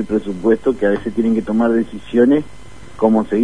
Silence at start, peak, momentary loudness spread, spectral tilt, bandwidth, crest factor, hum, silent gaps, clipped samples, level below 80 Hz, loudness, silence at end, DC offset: 0 s; 0 dBFS; 6 LU; -8 dB/octave; 10 kHz; 16 dB; none; none; under 0.1%; -44 dBFS; -17 LUFS; 0 s; 2%